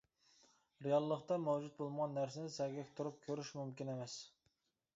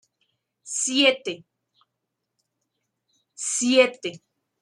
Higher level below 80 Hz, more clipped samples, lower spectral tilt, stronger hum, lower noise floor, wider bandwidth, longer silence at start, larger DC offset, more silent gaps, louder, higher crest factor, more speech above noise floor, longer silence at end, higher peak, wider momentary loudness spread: about the same, -84 dBFS vs -80 dBFS; neither; first, -6 dB/octave vs -1 dB/octave; neither; about the same, -83 dBFS vs -81 dBFS; second, 7.6 kHz vs 12 kHz; first, 0.8 s vs 0.65 s; neither; neither; second, -42 LUFS vs -22 LUFS; about the same, 20 dB vs 22 dB; second, 42 dB vs 59 dB; first, 0.7 s vs 0.45 s; second, -24 dBFS vs -4 dBFS; second, 10 LU vs 16 LU